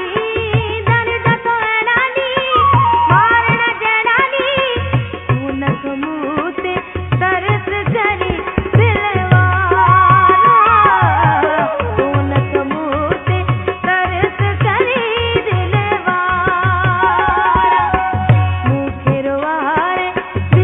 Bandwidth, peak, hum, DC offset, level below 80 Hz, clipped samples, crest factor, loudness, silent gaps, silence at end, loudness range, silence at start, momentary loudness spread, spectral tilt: 3.9 kHz; 0 dBFS; none; under 0.1%; -34 dBFS; under 0.1%; 14 dB; -14 LUFS; none; 0 s; 6 LU; 0 s; 9 LU; -9 dB/octave